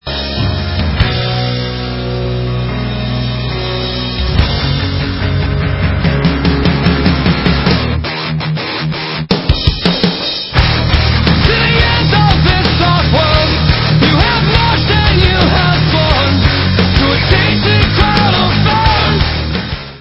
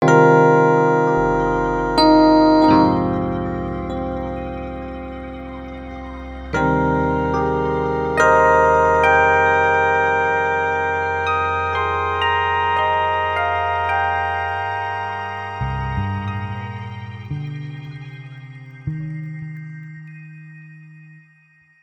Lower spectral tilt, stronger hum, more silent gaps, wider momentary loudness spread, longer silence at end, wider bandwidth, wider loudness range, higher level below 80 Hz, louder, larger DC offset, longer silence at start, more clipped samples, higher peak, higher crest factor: about the same, -7.5 dB/octave vs -6.5 dB/octave; neither; neither; second, 7 LU vs 20 LU; second, 0 s vs 0.7 s; second, 8 kHz vs 9.6 kHz; second, 6 LU vs 16 LU; first, -18 dBFS vs -38 dBFS; first, -12 LUFS vs -17 LUFS; neither; about the same, 0.05 s vs 0 s; neither; about the same, 0 dBFS vs 0 dBFS; second, 12 dB vs 18 dB